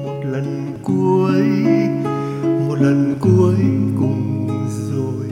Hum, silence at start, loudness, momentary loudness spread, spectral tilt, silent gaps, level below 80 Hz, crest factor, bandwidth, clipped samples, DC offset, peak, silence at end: none; 0 s; -17 LUFS; 8 LU; -8.5 dB/octave; none; -56 dBFS; 14 dB; 11.5 kHz; under 0.1%; under 0.1%; -2 dBFS; 0 s